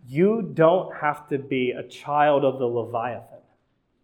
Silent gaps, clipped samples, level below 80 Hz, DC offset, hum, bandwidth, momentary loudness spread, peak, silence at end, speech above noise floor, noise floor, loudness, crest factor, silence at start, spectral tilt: none; under 0.1%; -70 dBFS; under 0.1%; none; 12.5 kHz; 11 LU; -4 dBFS; 0.65 s; 46 dB; -69 dBFS; -23 LUFS; 20 dB; 0.05 s; -8 dB/octave